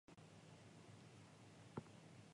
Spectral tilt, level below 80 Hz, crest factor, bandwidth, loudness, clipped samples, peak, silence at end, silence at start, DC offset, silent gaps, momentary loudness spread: -5.5 dB/octave; -82 dBFS; 26 dB; 11 kHz; -61 LUFS; under 0.1%; -36 dBFS; 0 s; 0.1 s; under 0.1%; none; 7 LU